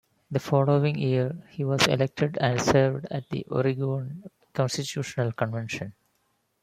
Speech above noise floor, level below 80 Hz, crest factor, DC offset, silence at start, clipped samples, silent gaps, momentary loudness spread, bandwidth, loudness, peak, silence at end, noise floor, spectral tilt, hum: 47 dB; -60 dBFS; 24 dB; under 0.1%; 0.3 s; under 0.1%; none; 11 LU; 15 kHz; -26 LUFS; -4 dBFS; 0.7 s; -72 dBFS; -5.5 dB/octave; none